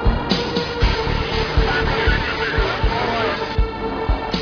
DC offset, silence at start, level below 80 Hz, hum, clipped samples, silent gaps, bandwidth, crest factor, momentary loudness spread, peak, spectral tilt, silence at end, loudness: under 0.1%; 0 s; -24 dBFS; none; under 0.1%; none; 5.4 kHz; 16 dB; 4 LU; -4 dBFS; -6 dB/octave; 0 s; -20 LUFS